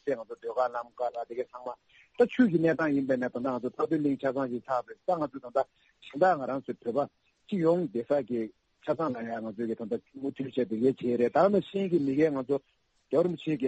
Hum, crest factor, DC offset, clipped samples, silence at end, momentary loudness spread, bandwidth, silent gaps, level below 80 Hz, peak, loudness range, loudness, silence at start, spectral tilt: none; 18 dB; under 0.1%; under 0.1%; 0 s; 11 LU; 8.4 kHz; none; -72 dBFS; -12 dBFS; 3 LU; -30 LUFS; 0.05 s; -8 dB/octave